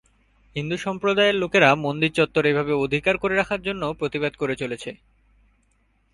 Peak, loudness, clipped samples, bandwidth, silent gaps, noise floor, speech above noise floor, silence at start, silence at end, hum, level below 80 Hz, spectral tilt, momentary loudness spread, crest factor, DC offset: 0 dBFS; -22 LUFS; under 0.1%; 11.5 kHz; none; -65 dBFS; 42 dB; 0.55 s; 1.2 s; none; -54 dBFS; -5.5 dB/octave; 12 LU; 22 dB; under 0.1%